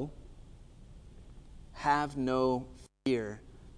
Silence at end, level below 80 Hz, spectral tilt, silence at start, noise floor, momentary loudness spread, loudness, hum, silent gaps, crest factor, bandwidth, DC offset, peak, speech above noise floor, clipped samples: 0.05 s; -52 dBFS; -6 dB/octave; 0 s; -52 dBFS; 20 LU; -33 LUFS; none; none; 20 dB; 10.5 kHz; under 0.1%; -16 dBFS; 21 dB; under 0.1%